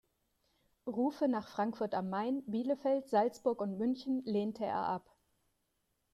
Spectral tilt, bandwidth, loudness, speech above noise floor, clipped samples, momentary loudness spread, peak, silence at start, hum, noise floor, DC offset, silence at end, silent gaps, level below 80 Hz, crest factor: -7 dB/octave; 13 kHz; -35 LUFS; 46 dB; under 0.1%; 5 LU; -18 dBFS; 0.85 s; none; -81 dBFS; under 0.1%; 1.15 s; none; -76 dBFS; 18 dB